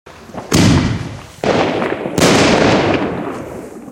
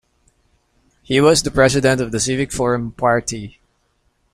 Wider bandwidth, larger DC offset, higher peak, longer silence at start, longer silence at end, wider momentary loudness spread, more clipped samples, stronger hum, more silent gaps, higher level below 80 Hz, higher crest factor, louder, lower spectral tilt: about the same, 16.5 kHz vs 15.5 kHz; neither; about the same, 0 dBFS vs -2 dBFS; second, 0.05 s vs 1.1 s; second, 0 s vs 0.85 s; first, 18 LU vs 9 LU; neither; neither; neither; first, -36 dBFS vs -42 dBFS; about the same, 14 dB vs 18 dB; first, -14 LUFS vs -17 LUFS; about the same, -5 dB/octave vs -4.5 dB/octave